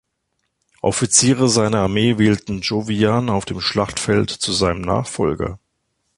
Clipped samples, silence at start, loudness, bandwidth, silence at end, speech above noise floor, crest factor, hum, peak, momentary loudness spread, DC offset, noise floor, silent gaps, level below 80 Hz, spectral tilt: under 0.1%; 0.85 s; -18 LUFS; 11.5 kHz; 0.6 s; 54 dB; 18 dB; none; 0 dBFS; 8 LU; under 0.1%; -72 dBFS; none; -42 dBFS; -4 dB/octave